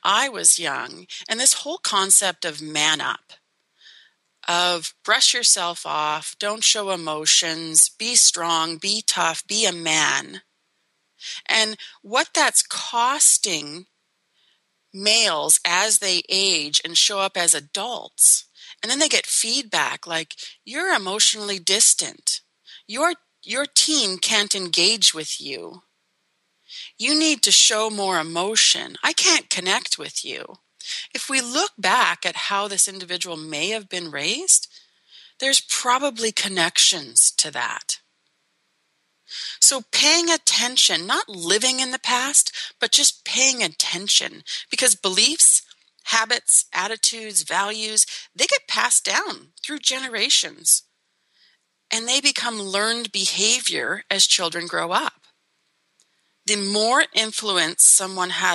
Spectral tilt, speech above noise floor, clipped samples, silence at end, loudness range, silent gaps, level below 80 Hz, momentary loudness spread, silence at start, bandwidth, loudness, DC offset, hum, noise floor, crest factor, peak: 0.5 dB/octave; 50 dB; under 0.1%; 0 s; 4 LU; none; -84 dBFS; 13 LU; 0.05 s; 13 kHz; -18 LUFS; under 0.1%; none; -71 dBFS; 20 dB; -2 dBFS